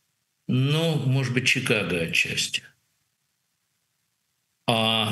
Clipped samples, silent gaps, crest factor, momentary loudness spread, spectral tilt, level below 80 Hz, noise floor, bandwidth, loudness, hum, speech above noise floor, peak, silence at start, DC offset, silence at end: under 0.1%; none; 22 dB; 7 LU; -4.5 dB/octave; -62 dBFS; -75 dBFS; 12.5 kHz; -23 LUFS; none; 51 dB; -4 dBFS; 0.5 s; under 0.1%; 0 s